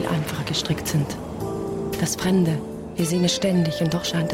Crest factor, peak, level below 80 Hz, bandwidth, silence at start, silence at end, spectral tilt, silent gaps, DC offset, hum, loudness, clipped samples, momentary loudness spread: 12 dB; -10 dBFS; -46 dBFS; 16.5 kHz; 0 s; 0 s; -5 dB/octave; none; under 0.1%; none; -23 LUFS; under 0.1%; 8 LU